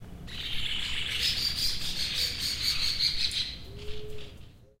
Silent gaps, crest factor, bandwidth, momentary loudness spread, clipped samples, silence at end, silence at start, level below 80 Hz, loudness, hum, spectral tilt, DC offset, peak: none; 18 dB; 16 kHz; 17 LU; under 0.1%; 0.15 s; 0 s; -44 dBFS; -28 LUFS; none; -1 dB/octave; under 0.1%; -12 dBFS